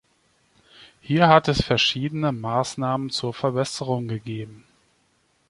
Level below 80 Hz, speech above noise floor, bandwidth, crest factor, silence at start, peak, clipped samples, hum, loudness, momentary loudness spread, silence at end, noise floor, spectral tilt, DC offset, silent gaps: -48 dBFS; 43 dB; 11.5 kHz; 22 dB; 0.8 s; -2 dBFS; under 0.1%; none; -22 LUFS; 14 LU; 0.9 s; -66 dBFS; -5 dB/octave; under 0.1%; none